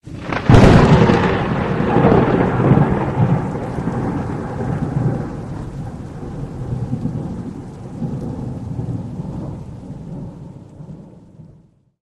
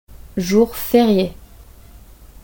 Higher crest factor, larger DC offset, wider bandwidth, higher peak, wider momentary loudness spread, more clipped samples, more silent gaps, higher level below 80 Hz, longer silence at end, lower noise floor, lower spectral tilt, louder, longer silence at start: about the same, 18 dB vs 18 dB; neither; second, 10.5 kHz vs 17 kHz; about the same, 0 dBFS vs 0 dBFS; first, 20 LU vs 11 LU; neither; neither; first, -30 dBFS vs -42 dBFS; second, 0.55 s vs 0.8 s; first, -50 dBFS vs -42 dBFS; first, -8 dB/octave vs -6 dB/octave; about the same, -17 LUFS vs -17 LUFS; about the same, 0.05 s vs 0.15 s